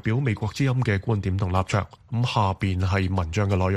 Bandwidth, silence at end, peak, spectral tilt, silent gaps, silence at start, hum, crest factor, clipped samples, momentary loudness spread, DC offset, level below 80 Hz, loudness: 10 kHz; 0 s; -6 dBFS; -7 dB/octave; none; 0.05 s; none; 16 dB; under 0.1%; 3 LU; under 0.1%; -44 dBFS; -25 LUFS